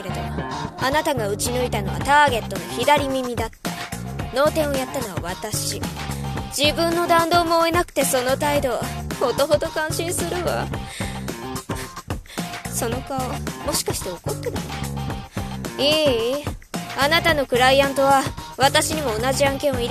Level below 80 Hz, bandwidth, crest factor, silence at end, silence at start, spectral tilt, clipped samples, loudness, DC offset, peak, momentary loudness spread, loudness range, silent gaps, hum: -38 dBFS; 14.5 kHz; 20 dB; 0 s; 0 s; -3.5 dB/octave; under 0.1%; -21 LUFS; under 0.1%; -2 dBFS; 12 LU; 8 LU; none; none